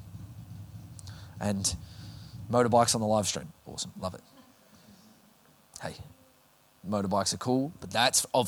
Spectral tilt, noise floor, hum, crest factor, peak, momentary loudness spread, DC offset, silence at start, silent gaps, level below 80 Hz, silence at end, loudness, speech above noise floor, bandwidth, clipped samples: -3.5 dB/octave; -63 dBFS; none; 22 dB; -10 dBFS; 22 LU; under 0.1%; 0 s; none; -58 dBFS; 0 s; -28 LUFS; 34 dB; over 20 kHz; under 0.1%